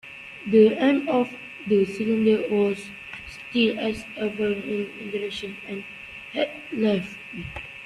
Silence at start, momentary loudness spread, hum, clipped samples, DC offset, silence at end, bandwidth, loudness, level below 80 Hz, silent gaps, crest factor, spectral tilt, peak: 0.05 s; 16 LU; none; under 0.1%; under 0.1%; 0 s; 11.5 kHz; -24 LUFS; -56 dBFS; none; 18 dB; -6.5 dB/octave; -6 dBFS